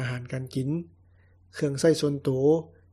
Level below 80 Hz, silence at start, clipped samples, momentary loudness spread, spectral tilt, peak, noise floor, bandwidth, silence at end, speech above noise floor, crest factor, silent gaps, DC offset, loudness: -62 dBFS; 0 s; under 0.1%; 11 LU; -6.5 dB/octave; -10 dBFS; -58 dBFS; 13.5 kHz; 0.25 s; 33 dB; 18 dB; none; under 0.1%; -27 LUFS